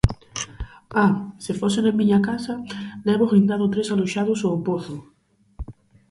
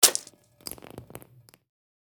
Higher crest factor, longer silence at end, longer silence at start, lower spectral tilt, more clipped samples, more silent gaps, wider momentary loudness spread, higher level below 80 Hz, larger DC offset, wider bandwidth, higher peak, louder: second, 20 dB vs 30 dB; second, 0.4 s vs 1.15 s; about the same, 0.05 s vs 0 s; first, -6.5 dB/octave vs 0.5 dB/octave; neither; neither; about the same, 20 LU vs 20 LU; first, -40 dBFS vs -66 dBFS; neither; second, 11.5 kHz vs over 20 kHz; about the same, -2 dBFS vs -2 dBFS; first, -22 LUFS vs -27 LUFS